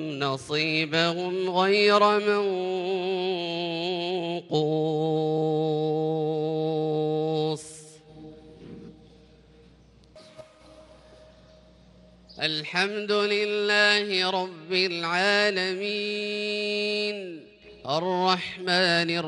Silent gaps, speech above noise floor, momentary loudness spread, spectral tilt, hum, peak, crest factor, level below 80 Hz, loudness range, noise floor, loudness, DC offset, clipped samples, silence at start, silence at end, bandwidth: none; 30 dB; 9 LU; -4.5 dB/octave; none; -6 dBFS; 20 dB; -66 dBFS; 9 LU; -55 dBFS; -25 LUFS; under 0.1%; under 0.1%; 0 s; 0 s; 11.5 kHz